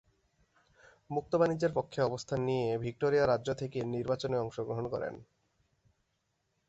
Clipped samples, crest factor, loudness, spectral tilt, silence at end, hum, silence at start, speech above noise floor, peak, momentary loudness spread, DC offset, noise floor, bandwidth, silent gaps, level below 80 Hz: under 0.1%; 20 dB; -33 LUFS; -6.5 dB/octave; 1.45 s; none; 1.1 s; 48 dB; -14 dBFS; 9 LU; under 0.1%; -80 dBFS; 8.2 kHz; none; -64 dBFS